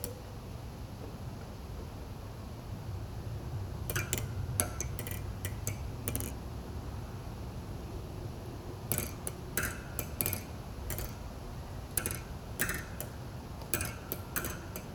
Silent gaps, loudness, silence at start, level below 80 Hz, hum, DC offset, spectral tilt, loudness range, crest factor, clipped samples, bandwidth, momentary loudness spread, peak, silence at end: none; -39 LUFS; 0 s; -46 dBFS; none; under 0.1%; -4 dB/octave; 5 LU; 32 dB; under 0.1%; over 20 kHz; 11 LU; -6 dBFS; 0 s